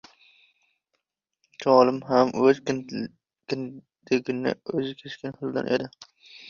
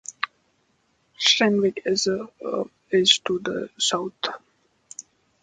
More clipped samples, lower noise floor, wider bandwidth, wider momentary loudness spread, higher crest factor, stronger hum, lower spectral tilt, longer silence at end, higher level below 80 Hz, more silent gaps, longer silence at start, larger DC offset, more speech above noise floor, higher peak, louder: neither; first, -79 dBFS vs -67 dBFS; second, 7.2 kHz vs 9.4 kHz; second, 16 LU vs 22 LU; about the same, 22 dB vs 24 dB; neither; first, -6 dB/octave vs -2.5 dB/octave; second, 0 s vs 0.4 s; about the same, -68 dBFS vs -66 dBFS; neither; first, 1.6 s vs 0.1 s; neither; first, 55 dB vs 44 dB; second, -4 dBFS vs 0 dBFS; second, -25 LUFS vs -22 LUFS